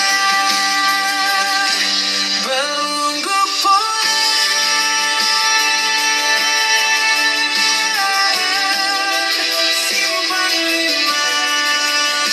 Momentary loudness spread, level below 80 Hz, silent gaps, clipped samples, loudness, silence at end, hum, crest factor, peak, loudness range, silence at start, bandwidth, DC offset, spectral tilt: 3 LU; -70 dBFS; none; under 0.1%; -14 LUFS; 0 s; none; 14 dB; -2 dBFS; 2 LU; 0 s; 16 kHz; under 0.1%; 1.5 dB/octave